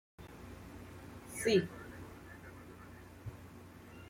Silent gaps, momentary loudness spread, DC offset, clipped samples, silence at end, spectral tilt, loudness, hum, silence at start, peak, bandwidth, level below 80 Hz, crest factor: none; 22 LU; under 0.1%; under 0.1%; 0 s; -5 dB/octave; -37 LUFS; 60 Hz at -60 dBFS; 0.2 s; -18 dBFS; 16.5 kHz; -62 dBFS; 24 dB